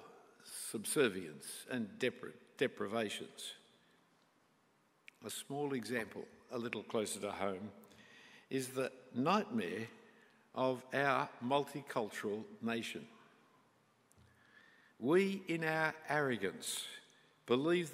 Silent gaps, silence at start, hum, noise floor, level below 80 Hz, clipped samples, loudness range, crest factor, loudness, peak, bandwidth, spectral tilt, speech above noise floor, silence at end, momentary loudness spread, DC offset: none; 0 s; none; -74 dBFS; -86 dBFS; under 0.1%; 7 LU; 22 dB; -39 LUFS; -18 dBFS; 16 kHz; -4 dB/octave; 35 dB; 0 s; 18 LU; under 0.1%